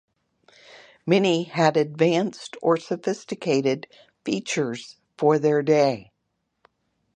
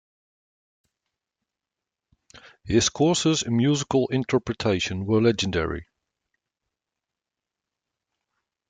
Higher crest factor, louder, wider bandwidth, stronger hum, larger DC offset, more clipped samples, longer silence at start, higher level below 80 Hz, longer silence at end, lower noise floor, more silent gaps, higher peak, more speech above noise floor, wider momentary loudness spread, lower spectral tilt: about the same, 20 dB vs 18 dB; about the same, -23 LUFS vs -23 LUFS; about the same, 10 kHz vs 9.6 kHz; neither; neither; neither; second, 1.05 s vs 2.35 s; second, -72 dBFS vs -52 dBFS; second, 1.15 s vs 2.85 s; second, -76 dBFS vs -88 dBFS; neither; first, -4 dBFS vs -8 dBFS; second, 54 dB vs 65 dB; first, 11 LU vs 5 LU; about the same, -5.5 dB/octave vs -4.5 dB/octave